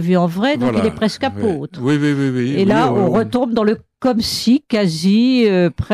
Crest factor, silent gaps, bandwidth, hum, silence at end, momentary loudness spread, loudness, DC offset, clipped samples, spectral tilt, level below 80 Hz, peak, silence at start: 10 dB; none; 14.5 kHz; none; 0 s; 6 LU; -16 LUFS; under 0.1%; under 0.1%; -6.5 dB/octave; -44 dBFS; -4 dBFS; 0 s